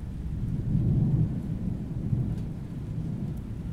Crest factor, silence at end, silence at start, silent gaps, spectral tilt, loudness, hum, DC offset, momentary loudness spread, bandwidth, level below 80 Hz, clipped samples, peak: 16 dB; 0 s; 0 s; none; -10 dB/octave; -30 LUFS; none; under 0.1%; 10 LU; 6 kHz; -38 dBFS; under 0.1%; -14 dBFS